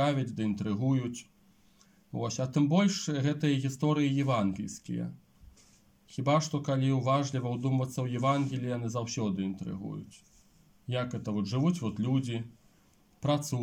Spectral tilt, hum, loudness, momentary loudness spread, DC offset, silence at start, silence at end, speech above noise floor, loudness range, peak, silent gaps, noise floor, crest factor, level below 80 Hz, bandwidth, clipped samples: -6.5 dB/octave; none; -31 LUFS; 11 LU; under 0.1%; 0 s; 0 s; 34 dB; 5 LU; -14 dBFS; none; -64 dBFS; 18 dB; -68 dBFS; 15.5 kHz; under 0.1%